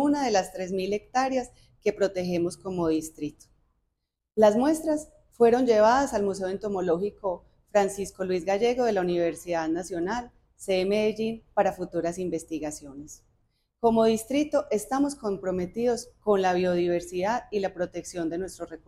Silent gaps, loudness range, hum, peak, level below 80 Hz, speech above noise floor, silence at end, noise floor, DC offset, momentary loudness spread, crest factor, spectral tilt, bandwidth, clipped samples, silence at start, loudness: none; 5 LU; none; -8 dBFS; -56 dBFS; 55 dB; 0.1 s; -81 dBFS; under 0.1%; 11 LU; 18 dB; -5.5 dB/octave; 15 kHz; under 0.1%; 0 s; -27 LUFS